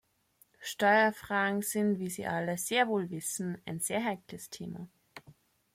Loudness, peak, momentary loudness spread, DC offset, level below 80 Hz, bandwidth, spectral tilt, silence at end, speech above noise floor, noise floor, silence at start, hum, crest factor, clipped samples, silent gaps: -31 LUFS; -14 dBFS; 17 LU; under 0.1%; -72 dBFS; 16.5 kHz; -4 dB/octave; 0.4 s; 37 dB; -68 dBFS; 0.6 s; none; 18 dB; under 0.1%; none